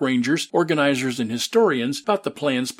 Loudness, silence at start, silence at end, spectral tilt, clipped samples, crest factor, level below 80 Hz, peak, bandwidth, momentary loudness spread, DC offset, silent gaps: -21 LUFS; 0 s; 0.05 s; -4.5 dB/octave; under 0.1%; 16 dB; -70 dBFS; -4 dBFS; 16 kHz; 5 LU; under 0.1%; none